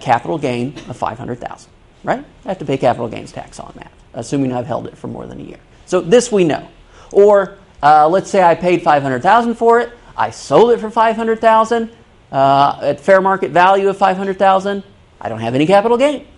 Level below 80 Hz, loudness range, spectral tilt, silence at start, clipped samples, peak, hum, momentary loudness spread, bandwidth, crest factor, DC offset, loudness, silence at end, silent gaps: -48 dBFS; 9 LU; -5.5 dB/octave; 0 s; under 0.1%; 0 dBFS; none; 17 LU; 11.5 kHz; 14 dB; under 0.1%; -14 LUFS; 0.15 s; none